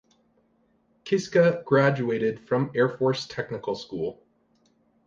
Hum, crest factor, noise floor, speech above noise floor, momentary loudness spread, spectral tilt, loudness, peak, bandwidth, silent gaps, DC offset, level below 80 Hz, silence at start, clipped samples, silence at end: none; 18 dB; -66 dBFS; 42 dB; 12 LU; -6.5 dB/octave; -25 LUFS; -8 dBFS; 7.6 kHz; none; under 0.1%; -66 dBFS; 1.05 s; under 0.1%; 0.95 s